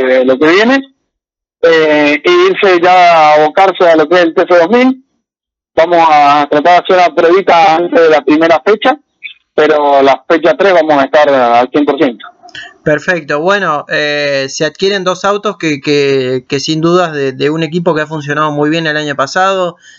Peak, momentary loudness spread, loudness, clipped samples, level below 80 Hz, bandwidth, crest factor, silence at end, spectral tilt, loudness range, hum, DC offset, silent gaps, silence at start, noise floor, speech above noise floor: 0 dBFS; 8 LU; -9 LUFS; under 0.1%; -56 dBFS; 7.6 kHz; 10 dB; 0.3 s; -5 dB/octave; 5 LU; none; under 0.1%; none; 0 s; -85 dBFS; 76 dB